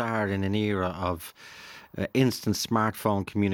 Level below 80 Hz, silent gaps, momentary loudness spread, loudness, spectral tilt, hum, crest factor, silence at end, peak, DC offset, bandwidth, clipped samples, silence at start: -62 dBFS; none; 17 LU; -27 LUFS; -5.5 dB/octave; none; 18 dB; 0 s; -8 dBFS; under 0.1%; 18 kHz; under 0.1%; 0 s